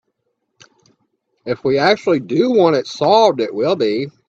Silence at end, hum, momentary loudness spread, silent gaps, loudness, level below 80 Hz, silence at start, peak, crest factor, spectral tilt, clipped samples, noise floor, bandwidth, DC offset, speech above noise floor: 0.2 s; none; 8 LU; none; -15 LUFS; -62 dBFS; 1.45 s; 0 dBFS; 16 dB; -5.5 dB/octave; under 0.1%; -71 dBFS; 7.8 kHz; under 0.1%; 56 dB